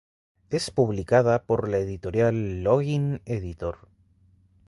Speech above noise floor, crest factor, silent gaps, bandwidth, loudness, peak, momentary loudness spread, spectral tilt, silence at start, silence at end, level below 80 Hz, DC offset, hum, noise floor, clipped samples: 36 dB; 18 dB; none; 11.5 kHz; -25 LUFS; -6 dBFS; 11 LU; -7 dB/octave; 0.5 s; 0.95 s; -48 dBFS; under 0.1%; none; -60 dBFS; under 0.1%